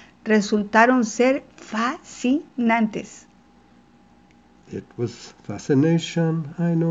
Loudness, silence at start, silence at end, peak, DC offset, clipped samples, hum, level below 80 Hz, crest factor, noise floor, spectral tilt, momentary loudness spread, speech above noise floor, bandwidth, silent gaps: -21 LUFS; 0.25 s; 0 s; -2 dBFS; under 0.1%; under 0.1%; none; -62 dBFS; 22 dB; -54 dBFS; -6 dB/octave; 18 LU; 32 dB; 8 kHz; none